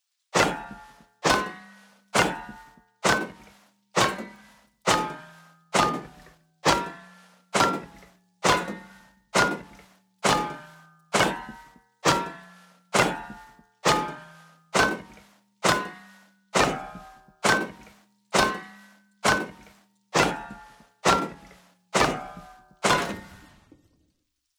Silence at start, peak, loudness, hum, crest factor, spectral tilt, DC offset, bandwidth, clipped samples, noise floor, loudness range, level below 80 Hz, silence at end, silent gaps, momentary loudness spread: 0.35 s; -4 dBFS; -25 LUFS; none; 24 dB; -3 dB/octave; under 0.1%; over 20 kHz; under 0.1%; -75 dBFS; 2 LU; -52 dBFS; 1.25 s; none; 19 LU